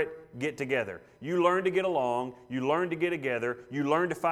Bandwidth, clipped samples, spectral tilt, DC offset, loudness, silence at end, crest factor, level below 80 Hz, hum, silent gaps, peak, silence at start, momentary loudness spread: 13 kHz; under 0.1%; -6 dB/octave; under 0.1%; -30 LUFS; 0 s; 20 dB; -70 dBFS; none; none; -10 dBFS; 0 s; 9 LU